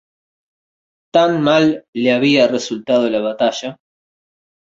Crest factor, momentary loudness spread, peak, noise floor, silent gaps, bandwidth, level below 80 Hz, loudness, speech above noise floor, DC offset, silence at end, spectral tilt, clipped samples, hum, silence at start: 16 dB; 7 LU; -2 dBFS; under -90 dBFS; 1.88-1.93 s; 8 kHz; -62 dBFS; -15 LUFS; over 75 dB; under 0.1%; 0.95 s; -5 dB/octave; under 0.1%; none; 1.15 s